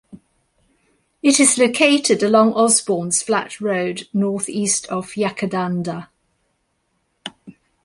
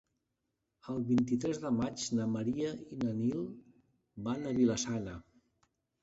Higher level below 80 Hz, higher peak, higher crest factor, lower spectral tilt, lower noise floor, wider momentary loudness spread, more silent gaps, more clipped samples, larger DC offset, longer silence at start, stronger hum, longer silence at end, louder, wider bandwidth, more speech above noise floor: about the same, -64 dBFS vs -64 dBFS; first, -2 dBFS vs -18 dBFS; about the same, 18 dB vs 18 dB; second, -3.5 dB/octave vs -5.5 dB/octave; second, -69 dBFS vs -84 dBFS; about the same, 14 LU vs 13 LU; neither; neither; neither; second, 0.15 s vs 0.85 s; neither; second, 0.35 s vs 0.8 s; first, -17 LUFS vs -34 LUFS; first, 11.5 kHz vs 8 kHz; about the same, 51 dB vs 51 dB